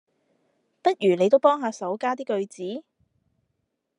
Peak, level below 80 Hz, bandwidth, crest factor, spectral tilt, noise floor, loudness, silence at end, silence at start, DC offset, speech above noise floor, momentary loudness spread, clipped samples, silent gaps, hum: -6 dBFS; -82 dBFS; 11 kHz; 20 dB; -5.5 dB/octave; -77 dBFS; -24 LUFS; 1.2 s; 0.85 s; under 0.1%; 54 dB; 15 LU; under 0.1%; none; none